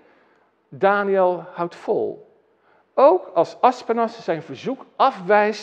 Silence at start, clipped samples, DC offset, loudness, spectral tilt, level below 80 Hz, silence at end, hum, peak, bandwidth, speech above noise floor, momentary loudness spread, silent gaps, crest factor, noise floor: 0.7 s; under 0.1%; under 0.1%; -20 LUFS; -6 dB/octave; -84 dBFS; 0 s; none; -2 dBFS; 8.2 kHz; 40 dB; 13 LU; none; 18 dB; -60 dBFS